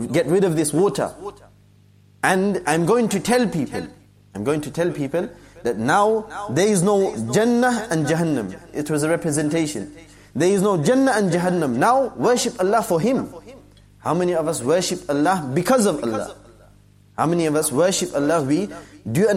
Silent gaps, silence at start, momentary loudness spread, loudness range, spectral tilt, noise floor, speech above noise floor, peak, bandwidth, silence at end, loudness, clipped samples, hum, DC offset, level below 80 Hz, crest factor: none; 0 s; 11 LU; 3 LU; -5 dB/octave; -52 dBFS; 33 dB; -4 dBFS; 16 kHz; 0 s; -20 LUFS; under 0.1%; 50 Hz at -45 dBFS; under 0.1%; -54 dBFS; 18 dB